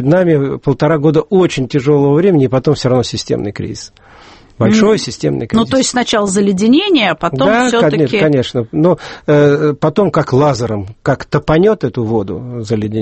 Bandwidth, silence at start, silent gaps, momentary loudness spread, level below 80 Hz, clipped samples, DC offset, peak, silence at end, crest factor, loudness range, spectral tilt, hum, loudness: 8.8 kHz; 0 s; none; 8 LU; -42 dBFS; under 0.1%; under 0.1%; 0 dBFS; 0 s; 12 dB; 3 LU; -6 dB/octave; none; -13 LUFS